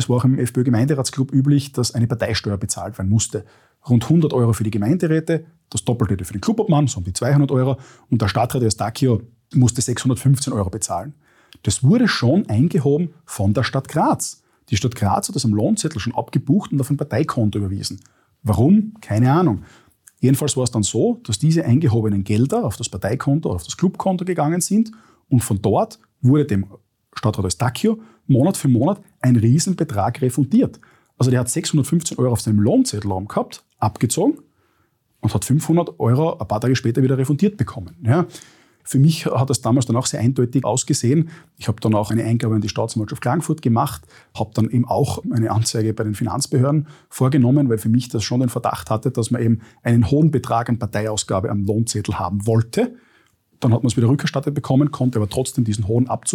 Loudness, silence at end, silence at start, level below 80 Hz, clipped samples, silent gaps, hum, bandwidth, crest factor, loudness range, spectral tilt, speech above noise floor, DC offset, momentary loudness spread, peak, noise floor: -19 LUFS; 0 s; 0 s; -50 dBFS; under 0.1%; none; none; 17 kHz; 14 dB; 2 LU; -6 dB/octave; 46 dB; under 0.1%; 8 LU; -4 dBFS; -64 dBFS